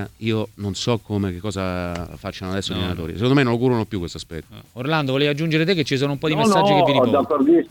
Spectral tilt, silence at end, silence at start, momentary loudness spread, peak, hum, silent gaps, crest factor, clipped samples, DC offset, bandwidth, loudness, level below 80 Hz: -6 dB/octave; 0 s; 0 s; 14 LU; -2 dBFS; none; none; 18 dB; under 0.1%; under 0.1%; 18 kHz; -20 LUFS; -48 dBFS